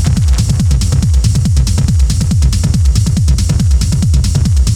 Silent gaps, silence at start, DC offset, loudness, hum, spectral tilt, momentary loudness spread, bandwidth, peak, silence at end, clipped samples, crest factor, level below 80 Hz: none; 0 s; under 0.1%; -12 LUFS; none; -5.5 dB/octave; 1 LU; 14 kHz; 0 dBFS; 0 s; under 0.1%; 10 dB; -12 dBFS